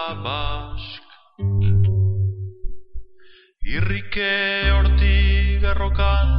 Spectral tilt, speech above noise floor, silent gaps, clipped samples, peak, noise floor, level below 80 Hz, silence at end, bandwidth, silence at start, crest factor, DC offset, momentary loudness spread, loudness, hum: -10 dB/octave; 27 dB; none; under 0.1%; -4 dBFS; -47 dBFS; -22 dBFS; 0 s; 5.4 kHz; 0 s; 14 dB; under 0.1%; 17 LU; -21 LUFS; none